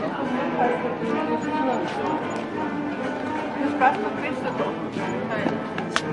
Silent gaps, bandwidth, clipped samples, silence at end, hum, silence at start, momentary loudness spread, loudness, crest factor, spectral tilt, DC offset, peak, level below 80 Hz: none; 11.5 kHz; under 0.1%; 0 s; none; 0 s; 7 LU; -25 LUFS; 24 dB; -5.5 dB/octave; under 0.1%; -2 dBFS; -60 dBFS